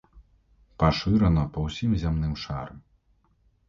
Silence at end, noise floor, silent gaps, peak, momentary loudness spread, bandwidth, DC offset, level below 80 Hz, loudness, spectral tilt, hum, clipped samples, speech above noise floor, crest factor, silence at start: 0.9 s; -66 dBFS; none; -8 dBFS; 12 LU; 7.4 kHz; under 0.1%; -36 dBFS; -26 LUFS; -7.5 dB/octave; none; under 0.1%; 41 dB; 20 dB; 0.15 s